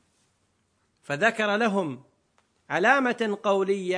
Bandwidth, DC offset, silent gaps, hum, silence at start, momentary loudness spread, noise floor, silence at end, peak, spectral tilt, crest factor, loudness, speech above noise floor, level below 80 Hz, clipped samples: 10.5 kHz; under 0.1%; none; none; 1.1 s; 12 LU; -71 dBFS; 0 s; -6 dBFS; -5 dB/octave; 22 dB; -24 LUFS; 46 dB; -78 dBFS; under 0.1%